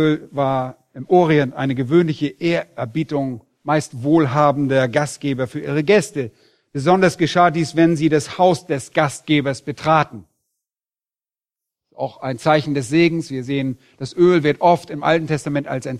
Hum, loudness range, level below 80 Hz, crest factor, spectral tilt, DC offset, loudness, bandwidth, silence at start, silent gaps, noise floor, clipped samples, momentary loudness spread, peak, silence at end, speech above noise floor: none; 5 LU; -56 dBFS; 18 dB; -6 dB/octave; under 0.1%; -18 LUFS; 12.5 kHz; 0 s; none; under -90 dBFS; under 0.1%; 11 LU; -2 dBFS; 0 s; over 72 dB